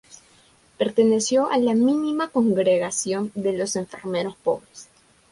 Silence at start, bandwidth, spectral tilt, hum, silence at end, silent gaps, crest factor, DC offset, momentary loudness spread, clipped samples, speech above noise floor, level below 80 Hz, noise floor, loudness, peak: 0.8 s; 11.5 kHz; -4.5 dB/octave; none; 0.5 s; none; 16 dB; under 0.1%; 8 LU; under 0.1%; 35 dB; -64 dBFS; -56 dBFS; -22 LUFS; -6 dBFS